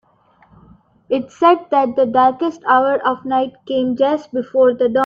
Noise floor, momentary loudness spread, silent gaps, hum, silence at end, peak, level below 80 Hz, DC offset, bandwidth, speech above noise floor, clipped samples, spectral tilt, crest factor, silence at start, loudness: -54 dBFS; 8 LU; none; none; 0 s; -2 dBFS; -60 dBFS; under 0.1%; 7.2 kHz; 38 dB; under 0.1%; -6 dB/octave; 16 dB; 1.1 s; -16 LUFS